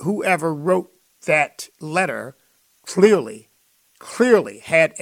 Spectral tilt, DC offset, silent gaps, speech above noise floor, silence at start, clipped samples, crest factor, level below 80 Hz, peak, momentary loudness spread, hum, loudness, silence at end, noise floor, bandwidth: -5 dB/octave; under 0.1%; none; 42 dB; 0 s; under 0.1%; 20 dB; -68 dBFS; -2 dBFS; 18 LU; none; -19 LUFS; 0 s; -61 dBFS; 16 kHz